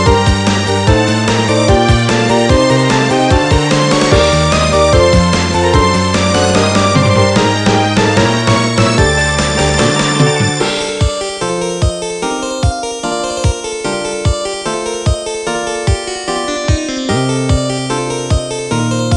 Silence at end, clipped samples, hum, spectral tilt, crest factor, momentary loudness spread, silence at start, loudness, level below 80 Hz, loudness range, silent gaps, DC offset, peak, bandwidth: 0 s; under 0.1%; none; -4.5 dB/octave; 12 dB; 7 LU; 0 s; -12 LUFS; -24 dBFS; 6 LU; none; under 0.1%; 0 dBFS; 11.5 kHz